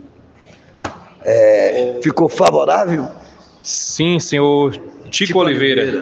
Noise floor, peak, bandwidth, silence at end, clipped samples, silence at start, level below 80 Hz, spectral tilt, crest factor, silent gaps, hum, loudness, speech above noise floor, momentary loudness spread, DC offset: -46 dBFS; 0 dBFS; 8.8 kHz; 0 s; under 0.1%; 0.85 s; -54 dBFS; -4.5 dB/octave; 16 dB; none; none; -15 LUFS; 32 dB; 19 LU; under 0.1%